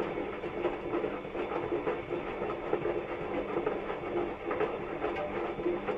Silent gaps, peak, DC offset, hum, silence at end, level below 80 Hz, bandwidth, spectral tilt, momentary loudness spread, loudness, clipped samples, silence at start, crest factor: none; -16 dBFS; under 0.1%; none; 0 s; -56 dBFS; 7.4 kHz; -7.5 dB/octave; 3 LU; -35 LUFS; under 0.1%; 0 s; 18 dB